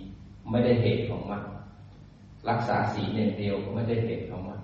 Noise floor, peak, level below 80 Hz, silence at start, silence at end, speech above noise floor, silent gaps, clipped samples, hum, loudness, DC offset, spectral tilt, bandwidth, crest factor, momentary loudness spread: -49 dBFS; -12 dBFS; -52 dBFS; 0 s; 0 s; 22 dB; none; under 0.1%; none; -28 LUFS; under 0.1%; -6.5 dB/octave; 7.2 kHz; 18 dB; 18 LU